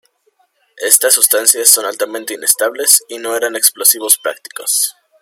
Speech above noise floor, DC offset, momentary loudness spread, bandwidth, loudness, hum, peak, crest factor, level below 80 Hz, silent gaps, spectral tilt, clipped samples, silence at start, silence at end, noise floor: 45 dB; under 0.1%; 12 LU; over 20 kHz; -11 LUFS; none; 0 dBFS; 14 dB; -66 dBFS; none; 2 dB/octave; 0.5%; 0.75 s; 0.3 s; -59 dBFS